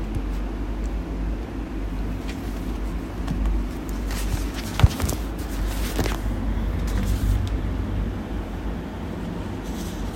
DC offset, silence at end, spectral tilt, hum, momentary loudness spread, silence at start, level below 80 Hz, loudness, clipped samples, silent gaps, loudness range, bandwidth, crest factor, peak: under 0.1%; 0 s; -6 dB/octave; none; 7 LU; 0 s; -28 dBFS; -28 LUFS; under 0.1%; none; 4 LU; 16.5 kHz; 24 dB; -2 dBFS